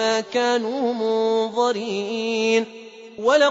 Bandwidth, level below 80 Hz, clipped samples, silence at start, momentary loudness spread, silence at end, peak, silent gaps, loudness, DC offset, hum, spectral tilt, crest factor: 7.8 kHz; -72 dBFS; under 0.1%; 0 s; 6 LU; 0 s; -6 dBFS; none; -22 LUFS; under 0.1%; none; -3.5 dB/octave; 14 dB